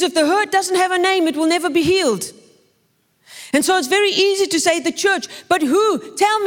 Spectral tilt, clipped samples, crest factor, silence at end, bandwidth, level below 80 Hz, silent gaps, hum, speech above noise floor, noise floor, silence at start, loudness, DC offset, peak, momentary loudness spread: -2.5 dB/octave; under 0.1%; 16 dB; 0 s; 18 kHz; -60 dBFS; none; none; 46 dB; -63 dBFS; 0 s; -17 LUFS; under 0.1%; -2 dBFS; 5 LU